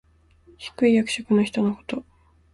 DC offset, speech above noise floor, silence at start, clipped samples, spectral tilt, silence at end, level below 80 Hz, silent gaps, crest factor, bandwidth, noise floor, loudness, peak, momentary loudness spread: under 0.1%; 33 dB; 0.6 s; under 0.1%; -5.5 dB/octave; 0.5 s; -58 dBFS; none; 16 dB; 11.5 kHz; -55 dBFS; -23 LUFS; -8 dBFS; 16 LU